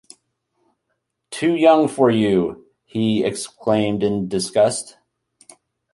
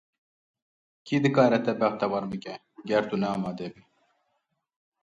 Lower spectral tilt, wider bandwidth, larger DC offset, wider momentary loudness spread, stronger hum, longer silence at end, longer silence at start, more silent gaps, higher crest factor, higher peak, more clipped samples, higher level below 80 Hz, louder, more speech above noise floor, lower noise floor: second, -5.5 dB/octave vs -7 dB/octave; first, 11.5 kHz vs 8.6 kHz; neither; second, 13 LU vs 17 LU; neither; second, 1.05 s vs 1.3 s; first, 1.3 s vs 1.05 s; neither; about the same, 20 dB vs 20 dB; first, 0 dBFS vs -8 dBFS; neither; first, -56 dBFS vs -68 dBFS; first, -19 LUFS vs -26 LUFS; first, 57 dB vs 51 dB; about the same, -75 dBFS vs -77 dBFS